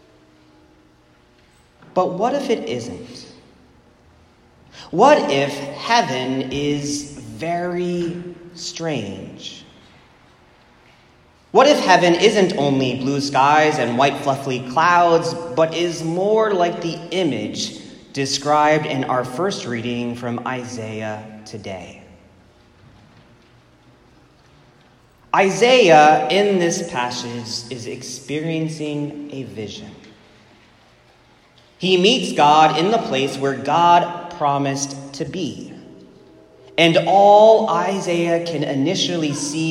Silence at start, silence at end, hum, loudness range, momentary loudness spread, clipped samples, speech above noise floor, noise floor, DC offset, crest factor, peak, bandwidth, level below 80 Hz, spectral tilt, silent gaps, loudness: 1.95 s; 0 s; none; 12 LU; 18 LU; under 0.1%; 36 dB; -53 dBFS; under 0.1%; 20 dB; 0 dBFS; 14 kHz; -58 dBFS; -4.5 dB/octave; none; -18 LUFS